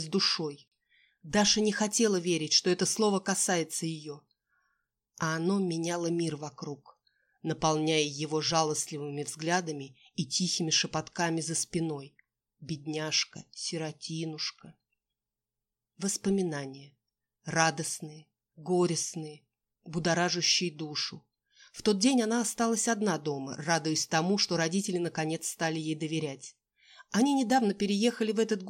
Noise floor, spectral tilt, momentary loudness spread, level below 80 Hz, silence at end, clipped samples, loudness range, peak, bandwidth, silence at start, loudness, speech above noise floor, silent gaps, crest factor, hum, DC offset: -90 dBFS; -3.5 dB/octave; 14 LU; -68 dBFS; 0 s; under 0.1%; 7 LU; -10 dBFS; 16 kHz; 0 s; -29 LUFS; 60 dB; none; 22 dB; none; under 0.1%